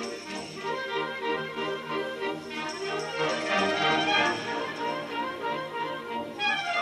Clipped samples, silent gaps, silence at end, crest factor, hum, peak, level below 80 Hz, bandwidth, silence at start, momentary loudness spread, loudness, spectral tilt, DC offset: under 0.1%; none; 0 s; 16 dB; none; -14 dBFS; -70 dBFS; 14.5 kHz; 0 s; 10 LU; -29 LUFS; -3.5 dB/octave; under 0.1%